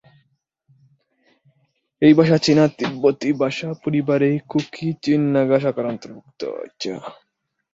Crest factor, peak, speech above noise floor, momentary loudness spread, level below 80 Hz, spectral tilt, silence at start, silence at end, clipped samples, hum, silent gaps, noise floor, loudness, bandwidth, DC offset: 18 dB; -2 dBFS; 48 dB; 15 LU; -62 dBFS; -6.5 dB/octave; 2 s; 0.6 s; under 0.1%; none; none; -67 dBFS; -19 LUFS; 7.8 kHz; under 0.1%